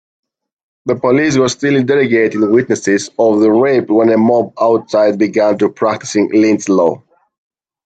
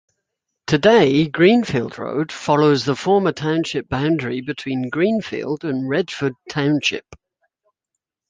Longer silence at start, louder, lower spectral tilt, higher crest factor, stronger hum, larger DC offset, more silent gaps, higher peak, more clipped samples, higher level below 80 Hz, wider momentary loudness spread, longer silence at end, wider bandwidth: first, 0.85 s vs 0.7 s; first, -12 LUFS vs -19 LUFS; about the same, -5.5 dB/octave vs -6 dB/octave; about the same, 12 dB vs 16 dB; neither; neither; neither; about the same, 0 dBFS vs -2 dBFS; neither; second, -58 dBFS vs -52 dBFS; second, 5 LU vs 11 LU; second, 0.9 s vs 1.15 s; about the same, 9 kHz vs 9.4 kHz